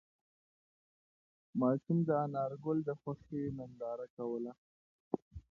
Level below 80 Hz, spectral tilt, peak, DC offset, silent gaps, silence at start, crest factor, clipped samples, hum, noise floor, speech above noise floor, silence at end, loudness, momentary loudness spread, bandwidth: -68 dBFS; -10.5 dB/octave; -20 dBFS; under 0.1%; 4.10-4.17 s, 4.58-5.11 s, 5.22-5.31 s; 1.55 s; 20 dB; under 0.1%; none; under -90 dBFS; over 54 dB; 0.1 s; -38 LUFS; 10 LU; 4.4 kHz